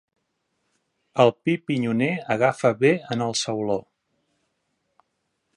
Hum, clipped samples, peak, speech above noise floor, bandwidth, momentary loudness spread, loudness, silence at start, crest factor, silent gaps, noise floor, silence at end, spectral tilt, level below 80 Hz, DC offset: none; under 0.1%; -2 dBFS; 54 dB; 11.5 kHz; 7 LU; -23 LUFS; 1.15 s; 22 dB; none; -75 dBFS; 1.75 s; -5 dB/octave; -66 dBFS; under 0.1%